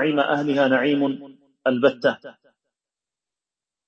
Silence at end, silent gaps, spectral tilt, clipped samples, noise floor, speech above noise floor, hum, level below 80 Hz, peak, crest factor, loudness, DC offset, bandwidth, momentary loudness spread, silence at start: 1.55 s; none; -6.5 dB/octave; under 0.1%; -90 dBFS; 69 dB; none; -72 dBFS; -6 dBFS; 18 dB; -21 LUFS; under 0.1%; 7 kHz; 8 LU; 0 s